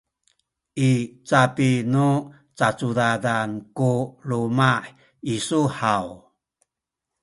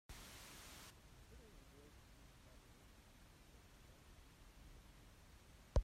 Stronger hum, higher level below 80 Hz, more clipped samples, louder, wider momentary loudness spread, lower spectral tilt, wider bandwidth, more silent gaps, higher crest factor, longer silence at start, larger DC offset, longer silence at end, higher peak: neither; about the same, -60 dBFS vs -56 dBFS; neither; first, -22 LUFS vs -59 LUFS; about the same, 10 LU vs 9 LU; about the same, -6 dB/octave vs -5 dB/octave; second, 11.5 kHz vs 16 kHz; neither; second, 20 dB vs 26 dB; first, 0.75 s vs 0.1 s; neither; first, 1.05 s vs 0 s; first, -2 dBFS vs -26 dBFS